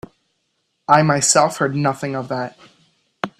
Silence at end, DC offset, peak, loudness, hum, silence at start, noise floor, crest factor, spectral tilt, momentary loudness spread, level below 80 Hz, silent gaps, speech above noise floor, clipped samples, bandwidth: 0.1 s; under 0.1%; 0 dBFS; -17 LUFS; none; 0.9 s; -70 dBFS; 20 dB; -4 dB/octave; 16 LU; -60 dBFS; none; 53 dB; under 0.1%; 14 kHz